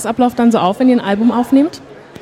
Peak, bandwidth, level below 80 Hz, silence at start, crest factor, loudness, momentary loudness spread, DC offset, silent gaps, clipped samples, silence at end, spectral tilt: -2 dBFS; 13 kHz; -52 dBFS; 0 s; 12 dB; -13 LUFS; 3 LU; under 0.1%; none; under 0.1%; 0.3 s; -6 dB/octave